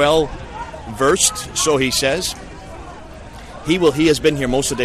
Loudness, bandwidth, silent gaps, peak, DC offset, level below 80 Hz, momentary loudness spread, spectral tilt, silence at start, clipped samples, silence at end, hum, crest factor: -17 LUFS; 14 kHz; none; -2 dBFS; under 0.1%; -36 dBFS; 21 LU; -3 dB/octave; 0 s; under 0.1%; 0 s; none; 16 dB